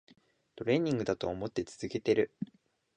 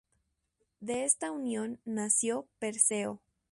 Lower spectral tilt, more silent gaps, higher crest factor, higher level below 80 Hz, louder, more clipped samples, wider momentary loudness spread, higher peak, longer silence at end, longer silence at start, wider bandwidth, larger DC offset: first, -6.5 dB/octave vs -2.5 dB/octave; neither; second, 18 dB vs 24 dB; first, -62 dBFS vs -76 dBFS; about the same, -33 LUFS vs -31 LUFS; neither; about the same, 10 LU vs 11 LU; second, -16 dBFS vs -10 dBFS; first, 0.5 s vs 0.35 s; second, 0.55 s vs 0.8 s; second, 9.6 kHz vs 11.5 kHz; neither